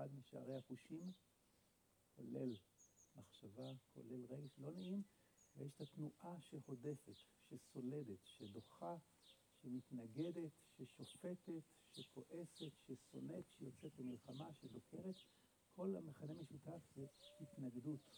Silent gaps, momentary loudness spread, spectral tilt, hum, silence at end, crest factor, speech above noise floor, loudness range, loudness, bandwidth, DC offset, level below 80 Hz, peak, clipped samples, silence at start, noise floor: none; 12 LU; -7 dB/octave; none; 0 s; 18 dB; 26 dB; 2 LU; -55 LUFS; over 20 kHz; under 0.1%; -88 dBFS; -36 dBFS; under 0.1%; 0 s; -80 dBFS